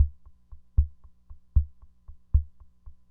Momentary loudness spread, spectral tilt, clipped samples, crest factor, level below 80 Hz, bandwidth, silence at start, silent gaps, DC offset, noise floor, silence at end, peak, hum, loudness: 9 LU; -12.5 dB/octave; under 0.1%; 20 dB; -32 dBFS; 1.2 kHz; 0 s; none; under 0.1%; -48 dBFS; 0.2 s; -10 dBFS; 60 Hz at -60 dBFS; -30 LUFS